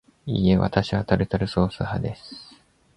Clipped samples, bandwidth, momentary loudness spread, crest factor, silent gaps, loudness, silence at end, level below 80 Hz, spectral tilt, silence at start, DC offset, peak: under 0.1%; 10 kHz; 16 LU; 20 dB; none; -23 LUFS; 0.55 s; -40 dBFS; -8 dB/octave; 0.25 s; under 0.1%; -4 dBFS